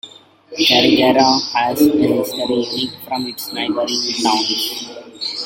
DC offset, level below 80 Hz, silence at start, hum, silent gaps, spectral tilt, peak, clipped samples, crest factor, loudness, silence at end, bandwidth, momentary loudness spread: under 0.1%; -56 dBFS; 0.05 s; none; none; -3.5 dB/octave; 0 dBFS; under 0.1%; 16 dB; -16 LUFS; 0 s; 16.5 kHz; 12 LU